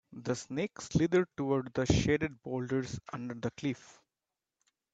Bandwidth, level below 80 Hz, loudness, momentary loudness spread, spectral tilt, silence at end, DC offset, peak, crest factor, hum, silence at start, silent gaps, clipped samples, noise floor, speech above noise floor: 8.8 kHz; -54 dBFS; -33 LUFS; 11 LU; -6 dB/octave; 1 s; under 0.1%; -14 dBFS; 20 dB; none; 0.1 s; none; under 0.1%; under -90 dBFS; over 57 dB